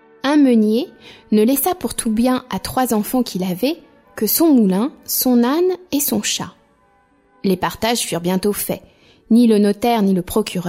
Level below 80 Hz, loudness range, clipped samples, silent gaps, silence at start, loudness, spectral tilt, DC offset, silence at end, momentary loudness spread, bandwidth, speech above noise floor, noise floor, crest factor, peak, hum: -48 dBFS; 3 LU; under 0.1%; none; 0.25 s; -17 LUFS; -4.5 dB/octave; under 0.1%; 0 s; 9 LU; 16.5 kHz; 39 dB; -56 dBFS; 14 dB; -4 dBFS; none